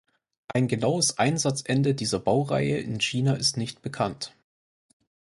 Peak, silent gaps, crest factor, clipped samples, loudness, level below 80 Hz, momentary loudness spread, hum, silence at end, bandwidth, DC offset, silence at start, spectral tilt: -6 dBFS; none; 20 dB; under 0.1%; -25 LUFS; -60 dBFS; 8 LU; none; 1.05 s; 11.5 kHz; under 0.1%; 0.5 s; -4.5 dB/octave